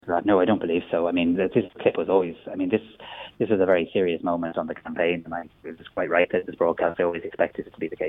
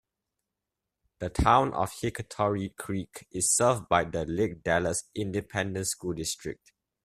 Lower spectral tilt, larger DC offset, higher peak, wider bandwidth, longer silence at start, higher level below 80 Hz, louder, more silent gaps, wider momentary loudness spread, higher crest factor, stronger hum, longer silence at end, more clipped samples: first, -9 dB/octave vs -4 dB/octave; neither; about the same, -6 dBFS vs -6 dBFS; second, 3.9 kHz vs 15.5 kHz; second, 0.05 s vs 1.2 s; second, -60 dBFS vs -46 dBFS; first, -24 LUFS vs -28 LUFS; neither; about the same, 13 LU vs 12 LU; about the same, 18 dB vs 22 dB; neither; second, 0 s vs 0.5 s; neither